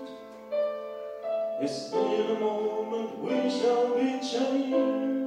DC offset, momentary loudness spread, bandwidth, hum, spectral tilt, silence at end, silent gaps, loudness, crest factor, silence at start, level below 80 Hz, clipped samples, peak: under 0.1%; 9 LU; 10.5 kHz; none; -5 dB/octave; 0 s; none; -29 LUFS; 14 dB; 0 s; -76 dBFS; under 0.1%; -14 dBFS